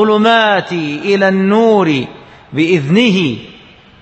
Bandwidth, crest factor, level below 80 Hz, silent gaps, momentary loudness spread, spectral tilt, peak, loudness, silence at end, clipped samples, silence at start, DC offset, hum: 8.4 kHz; 12 dB; -54 dBFS; none; 9 LU; -6 dB/octave; 0 dBFS; -12 LUFS; 0.5 s; under 0.1%; 0 s; under 0.1%; none